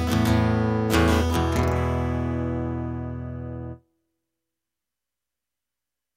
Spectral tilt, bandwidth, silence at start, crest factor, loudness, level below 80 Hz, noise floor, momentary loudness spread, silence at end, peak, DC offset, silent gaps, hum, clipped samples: -6.5 dB/octave; 16 kHz; 0 s; 18 dB; -24 LUFS; -36 dBFS; -88 dBFS; 13 LU; 2.4 s; -8 dBFS; under 0.1%; none; 60 Hz at -65 dBFS; under 0.1%